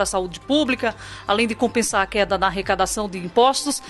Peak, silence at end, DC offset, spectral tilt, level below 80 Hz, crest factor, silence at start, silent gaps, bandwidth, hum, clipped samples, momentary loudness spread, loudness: -2 dBFS; 0 s; under 0.1%; -3 dB/octave; -44 dBFS; 18 dB; 0 s; none; 12.5 kHz; none; under 0.1%; 7 LU; -21 LUFS